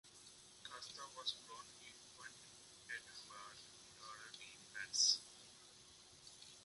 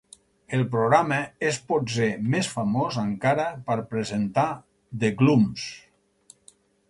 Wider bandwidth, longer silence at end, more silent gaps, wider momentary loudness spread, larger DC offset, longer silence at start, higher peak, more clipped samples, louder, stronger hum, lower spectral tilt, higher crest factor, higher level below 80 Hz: about the same, 11.5 kHz vs 11.5 kHz; second, 0 s vs 1.1 s; neither; first, 24 LU vs 9 LU; neither; second, 0.05 s vs 0.5 s; second, -22 dBFS vs -4 dBFS; neither; second, -43 LUFS vs -24 LUFS; neither; second, 1.5 dB/octave vs -6 dB/octave; first, 28 dB vs 20 dB; second, -84 dBFS vs -60 dBFS